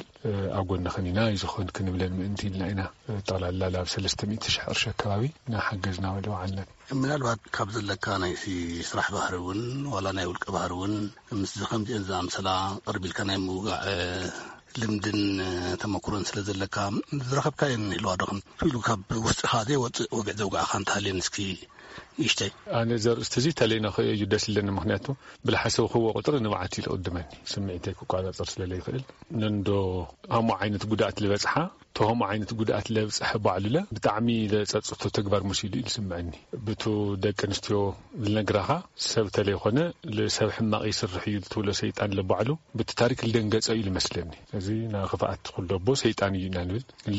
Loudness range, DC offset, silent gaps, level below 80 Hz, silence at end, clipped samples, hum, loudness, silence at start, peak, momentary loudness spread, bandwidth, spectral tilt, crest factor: 3 LU; under 0.1%; none; -52 dBFS; 0 s; under 0.1%; none; -28 LUFS; 0 s; -8 dBFS; 7 LU; 8 kHz; -4.5 dB/octave; 20 dB